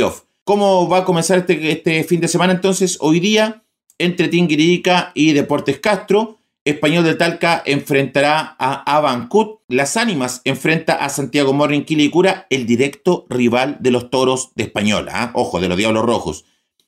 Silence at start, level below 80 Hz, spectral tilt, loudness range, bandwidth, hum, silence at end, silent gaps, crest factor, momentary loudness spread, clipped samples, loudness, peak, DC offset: 0 s; -54 dBFS; -4.5 dB/octave; 2 LU; 16 kHz; none; 0.5 s; 0.41-0.46 s, 6.61-6.66 s, 9.64-9.68 s; 12 dB; 6 LU; under 0.1%; -16 LUFS; -4 dBFS; under 0.1%